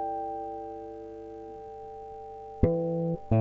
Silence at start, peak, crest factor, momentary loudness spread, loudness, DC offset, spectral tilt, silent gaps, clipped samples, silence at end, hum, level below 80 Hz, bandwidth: 0 s; -8 dBFS; 24 dB; 15 LU; -34 LUFS; under 0.1%; -11.5 dB/octave; none; under 0.1%; 0 s; 50 Hz at -55 dBFS; -46 dBFS; 4.8 kHz